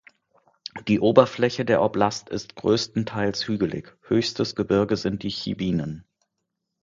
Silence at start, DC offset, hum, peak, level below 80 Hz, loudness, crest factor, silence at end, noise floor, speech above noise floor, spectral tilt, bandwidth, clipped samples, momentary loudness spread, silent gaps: 0.75 s; under 0.1%; none; 0 dBFS; -54 dBFS; -23 LUFS; 24 dB; 0.8 s; -80 dBFS; 57 dB; -6 dB/octave; 7.6 kHz; under 0.1%; 15 LU; none